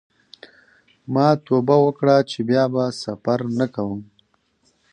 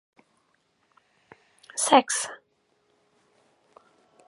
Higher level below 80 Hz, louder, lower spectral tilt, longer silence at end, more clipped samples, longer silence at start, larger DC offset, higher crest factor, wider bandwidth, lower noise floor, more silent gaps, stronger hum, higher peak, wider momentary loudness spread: first, -62 dBFS vs -86 dBFS; first, -20 LUFS vs -23 LUFS; first, -7 dB/octave vs -1 dB/octave; second, 0.9 s vs 1.95 s; neither; second, 1.1 s vs 1.75 s; neither; second, 18 dB vs 28 dB; second, 9.8 kHz vs 12 kHz; second, -64 dBFS vs -70 dBFS; neither; neither; about the same, -2 dBFS vs -4 dBFS; second, 10 LU vs 18 LU